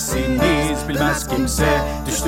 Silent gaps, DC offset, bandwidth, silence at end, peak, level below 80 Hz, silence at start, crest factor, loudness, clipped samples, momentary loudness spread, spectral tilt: none; under 0.1%; 17 kHz; 0 s; -4 dBFS; -28 dBFS; 0 s; 14 dB; -19 LUFS; under 0.1%; 4 LU; -4.5 dB/octave